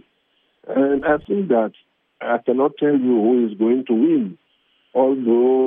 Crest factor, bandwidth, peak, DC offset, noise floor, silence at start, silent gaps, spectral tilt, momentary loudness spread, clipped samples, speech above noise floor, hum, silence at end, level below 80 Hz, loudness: 14 dB; 3.7 kHz; -4 dBFS; under 0.1%; -65 dBFS; 0.65 s; none; -11 dB/octave; 8 LU; under 0.1%; 48 dB; none; 0 s; -58 dBFS; -19 LUFS